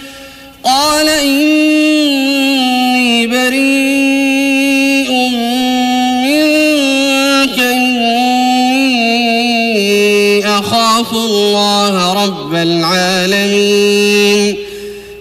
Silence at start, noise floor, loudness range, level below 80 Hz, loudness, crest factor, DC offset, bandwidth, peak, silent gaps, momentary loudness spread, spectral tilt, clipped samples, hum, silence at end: 0 s; -33 dBFS; 1 LU; -48 dBFS; -10 LUFS; 8 dB; under 0.1%; 15.5 kHz; -4 dBFS; none; 4 LU; -3.5 dB/octave; under 0.1%; none; 0 s